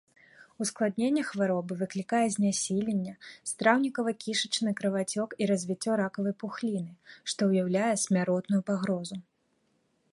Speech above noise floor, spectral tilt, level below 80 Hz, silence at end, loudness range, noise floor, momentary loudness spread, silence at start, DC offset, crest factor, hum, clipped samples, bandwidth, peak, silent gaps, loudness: 44 dB; -4.5 dB/octave; -72 dBFS; 0.95 s; 2 LU; -73 dBFS; 8 LU; 0.4 s; under 0.1%; 22 dB; none; under 0.1%; 11.5 kHz; -8 dBFS; none; -29 LUFS